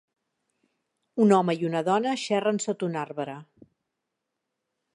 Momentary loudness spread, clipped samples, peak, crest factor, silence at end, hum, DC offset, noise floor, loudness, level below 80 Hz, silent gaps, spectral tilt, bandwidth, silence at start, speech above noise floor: 15 LU; under 0.1%; -6 dBFS; 22 dB; 1.5 s; none; under 0.1%; -83 dBFS; -25 LUFS; -78 dBFS; none; -5.5 dB/octave; 11 kHz; 1.15 s; 58 dB